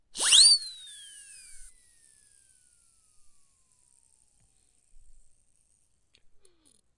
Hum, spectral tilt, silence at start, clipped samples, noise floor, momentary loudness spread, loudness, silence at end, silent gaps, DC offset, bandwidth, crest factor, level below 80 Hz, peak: none; 4 dB/octave; 0.15 s; under 0.1%; -71 dBFS; 31 LU; -17 LUFS; 5.35 s; none; under 0.1%; 11.5 kHz; 26 dB; -64 dBFS; -6 dBFS